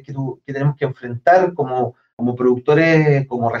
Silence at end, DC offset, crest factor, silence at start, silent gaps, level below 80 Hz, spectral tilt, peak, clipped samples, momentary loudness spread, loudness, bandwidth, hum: 0 s; under 0.1%; 14 dB; 0.1 s; 2.13-2.17 s; -58 dBFS; -8.5 dB/octave; -4 dBFS; under 0.1%; 12 LU; -17 LUFS; 7 kHz; none